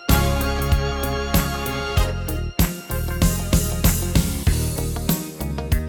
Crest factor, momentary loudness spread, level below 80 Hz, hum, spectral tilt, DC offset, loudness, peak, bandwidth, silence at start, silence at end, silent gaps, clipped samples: 18 dB; 7 LU; -24 dBFS; none; -5 dB/octave; under 0.1%; -22 LUFS; -2 dBFS; over 20 kHz; 0 s; 0 s; none; under 0.1%